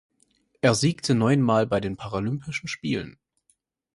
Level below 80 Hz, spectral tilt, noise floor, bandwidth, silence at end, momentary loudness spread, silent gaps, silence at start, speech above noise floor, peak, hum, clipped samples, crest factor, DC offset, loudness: -54 dBFS; -5.5 dB/octave; -70 dBFS; 11.5 kHz; 0.85 s; 10 LU; none; 0.65 s; 46 dB; -4 dBFS; none; under 0.1%; 22 dB; under 0.1%; -24 LUFS